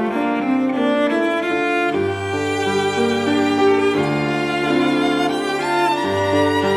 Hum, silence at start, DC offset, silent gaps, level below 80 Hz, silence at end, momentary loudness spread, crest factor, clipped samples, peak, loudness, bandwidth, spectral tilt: none; 0 s; under 0.1%; none; -56 dBFS; 0 s; 4 LU; 12 dB; under 0.1%; -6 dBFS; -18 LUFS; 14 kHz; -5.5 dB/octave